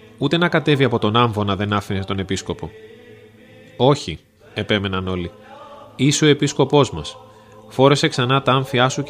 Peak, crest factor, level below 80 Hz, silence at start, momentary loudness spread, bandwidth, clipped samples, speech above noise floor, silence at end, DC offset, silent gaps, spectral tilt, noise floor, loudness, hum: 0 dBFS; 20 dB; -50 dBFS; 0.2 s; 15 LU; 15 kHz; under 0.1%; 27 dB; 0 s; under 0.1%; none; -5 dB/octave; -45 dBFS; -18 LUFS; none